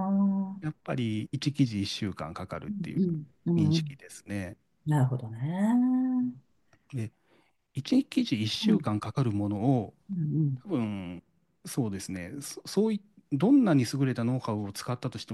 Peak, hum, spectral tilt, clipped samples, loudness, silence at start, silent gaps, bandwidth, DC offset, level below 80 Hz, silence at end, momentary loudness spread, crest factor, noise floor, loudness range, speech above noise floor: -12 dBFS; none; -6.5 dB/octave; under 0.1%; -30 LUFS; 0 s; none; 12.5 kHz; under 0.1%; -66 dBFS; 0 s; 13 LU; 16 dB; -68 dBFS; 4 LU; 39 dB